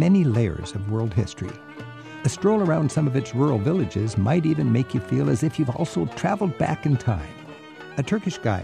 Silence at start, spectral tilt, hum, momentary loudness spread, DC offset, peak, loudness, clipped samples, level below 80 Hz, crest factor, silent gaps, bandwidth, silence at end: 0 s; -7.5 dB/octave; none; 14 LU; under 0.1%; -8 dBFS; -23 LUFS; under 0.1%; -48 dBFS; 14 dB; none; 11 kHz; 0 s